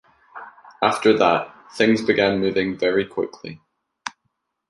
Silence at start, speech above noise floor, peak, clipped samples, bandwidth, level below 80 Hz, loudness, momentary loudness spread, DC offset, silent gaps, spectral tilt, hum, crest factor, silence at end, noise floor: 0.35 s; 55 dB; -2 dBFS; under 0.1%; 11.5 kHz; -58 dBFS; -20 LUFS; 21 LU; under 0.1%; none; -5 dB/octave; none; 20 dB; 0.6 s; -74 dBFS